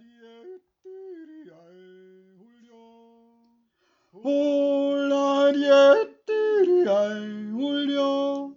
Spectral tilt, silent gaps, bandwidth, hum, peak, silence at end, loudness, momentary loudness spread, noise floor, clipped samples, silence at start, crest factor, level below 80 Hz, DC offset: -5 dB/octave; none; 7.4 kHz; none; -6 dBFS; 0.05 s; -22 LUFS; 19 LU; -69 dBFS; under 0.1%; 0.45 s; 18 dB; -84 dBFS; under 0.1%